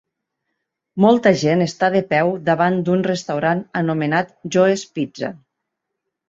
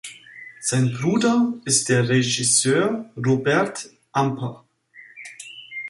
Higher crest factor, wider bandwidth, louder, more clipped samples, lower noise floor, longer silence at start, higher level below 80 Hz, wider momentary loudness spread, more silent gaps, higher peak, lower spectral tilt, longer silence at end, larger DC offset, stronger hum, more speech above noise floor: about the same, 18 dB vs 18 dB; second, 7.8 kHz vs 11.5 kHz; about the same, -18 LUFS vs -20 LUFS; neither; first, -79 dBFS vs -49 dBFS; first, 0.95 s vs 0.05 s; about the same, -60 dBFS vs -62 dBFS; second, 10 LU vs 20 LU; neither; first, -2 dBFS vs -6 dBFS; first, -6 dB/octave vs -4 dB/octave; first, 0.9 s vs 0 s; neither; neither; first, 61 dB vs 29 dB